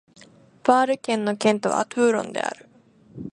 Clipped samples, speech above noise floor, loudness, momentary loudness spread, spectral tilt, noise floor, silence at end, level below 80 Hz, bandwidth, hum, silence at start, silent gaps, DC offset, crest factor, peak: under 0.1%; 32 dB; -22 LUFS; 11 LU; -4.5 dB/octave; -53 dBFS; 0.05 s; -66 dBFS; 11.5 kHz; none; 0.65 s; none; under 0.1%; 20 dB; -2 dBFS